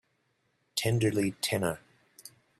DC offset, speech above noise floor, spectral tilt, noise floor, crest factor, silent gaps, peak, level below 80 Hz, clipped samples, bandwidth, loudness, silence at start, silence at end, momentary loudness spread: under 0.1%; 46 dB; -5 dB/octave; -75 dBFS; 18 dB; none; -14 dBFS; -64 dBFS; under 0.1%; 15.5 kHz; -30 LUFS; 0.75 s; 0.3 s; 23 LU